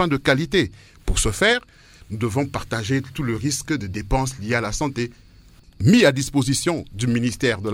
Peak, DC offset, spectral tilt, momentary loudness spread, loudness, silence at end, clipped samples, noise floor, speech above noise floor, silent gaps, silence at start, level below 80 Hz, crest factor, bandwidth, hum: -2 dBFS; under 0.1%; -4.5 dB/octave; 9 LU; -21 LUFS; 0 s; under 0.1%; -49 dBFS; 28 dB; none; 0 s; -34 dBFS; 20 dB; 16.5 kHz; none